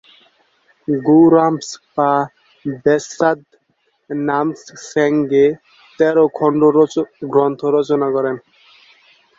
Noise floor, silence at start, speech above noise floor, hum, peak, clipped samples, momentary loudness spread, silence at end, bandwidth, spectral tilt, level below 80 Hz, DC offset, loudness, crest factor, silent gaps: -64 dBFS; 0.9 s; 49 dB; none; -2 dBFS; under 0.1%; 15 LU; 1 s; 7.8 kHz; -6.5 dB/octave; -60 dBFS; under 0.1%; -16 LUFS; 16 dB; none